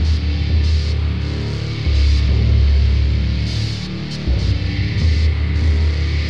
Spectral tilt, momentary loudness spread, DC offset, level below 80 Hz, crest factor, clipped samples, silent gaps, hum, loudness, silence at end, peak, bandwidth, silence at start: -6.5 dB/octave; 7 LU; under 0.1%; -18 dBFS; 10 dB; under 0.1%; none; none; -18 LUFS; 0 s; -6 dBFS; 7.2 kHz; 0 s